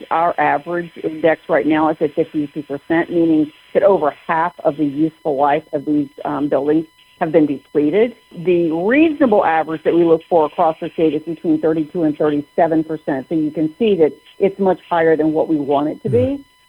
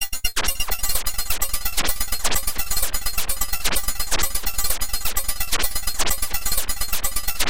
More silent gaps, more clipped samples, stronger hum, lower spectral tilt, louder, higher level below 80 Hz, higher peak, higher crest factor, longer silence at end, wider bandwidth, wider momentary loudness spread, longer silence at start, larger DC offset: neither; neither; neither; first, -8.5 dB/octave vs -0.5 dB/octave; first, -17 LUFS vs -23 LUFS; second, -56 dBFS vs -30 dBFS; about the same, -2 dBFS vs -4 dBFS; about the same, 16 dB vs 18 dB; first, 0.25 s vs 0 s; second, 5.2 kHz vs 17.5 kHz; first, 6 LU vs 2 LU; about the same, 0 s vs 0 s; second, under 0.1% vs 9%